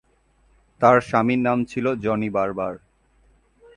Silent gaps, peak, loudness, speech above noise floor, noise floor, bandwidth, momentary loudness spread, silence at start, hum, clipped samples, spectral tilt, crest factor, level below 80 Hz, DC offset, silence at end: none; -2 dBFS; -21 LUFS; 41 dB; -61 dBFS; 10.5 kHz; 11 LU; 0.8 s; none; under 0.1%; -7.5 dB/octave; 22 dB; -54 dBFS; under 0.1%; 1 s